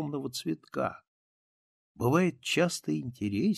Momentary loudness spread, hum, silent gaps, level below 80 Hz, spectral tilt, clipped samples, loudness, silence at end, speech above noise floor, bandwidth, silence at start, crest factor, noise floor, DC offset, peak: 8 LU; none; 1.08-1.95 s; -66 dBFS; -5.5 dB/octave; under 0.1%; -31 LUFS; 0 s; over 60 dB; 14.5 kHz; 0 s; 20 dB; under -90 dBFS; under 0.1%; -10 dBFS